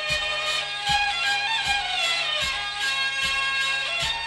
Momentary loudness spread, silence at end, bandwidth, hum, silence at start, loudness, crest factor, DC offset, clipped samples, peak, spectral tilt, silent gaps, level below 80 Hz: 3 LU; 0 s; 14 kHz; none; 0 s; -23 LUFS; 14 dB; under 0.1%; under 0.1%; -12 dBFS; 0 dB/octave; none; -48 dBFS